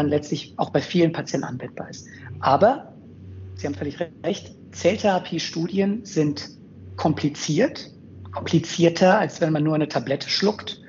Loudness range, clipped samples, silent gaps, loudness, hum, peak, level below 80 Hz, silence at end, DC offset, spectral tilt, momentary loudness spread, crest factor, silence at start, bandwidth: 4 LU; under 0.1%; none; -23 LUFS; none; -4 dBFS; -62 dBFS; 0 s; under 0.1%; -5 dB/octave; 19 LU; 20 dB; 0 s; 7.6 kHz